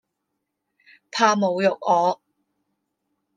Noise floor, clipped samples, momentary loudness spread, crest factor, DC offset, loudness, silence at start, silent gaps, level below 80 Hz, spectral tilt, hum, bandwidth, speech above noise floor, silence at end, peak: -79 dBFS; under 0.1%; 11 LU; 22 dB; under 0.1%; -21 LUFS; 1.15 s; none; -80 dBFS; -4.5 dB/octave; none; 9.6 kHz; 59 dB; 1.2 s; -4 dBFS